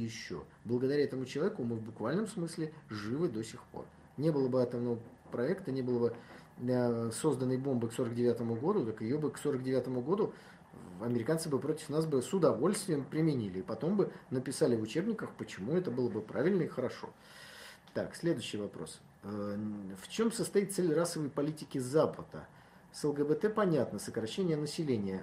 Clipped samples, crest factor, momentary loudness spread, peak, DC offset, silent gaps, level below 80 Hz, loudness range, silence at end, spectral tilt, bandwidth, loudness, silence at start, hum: under 0.1%; 20 dB; 13 LU; -16 dBFS; under 0.1%; none; -72 dBFS; 4 LU; 0 s; -6 dB/octave; 15.5 kHz; -34 LUFS; 0 s; none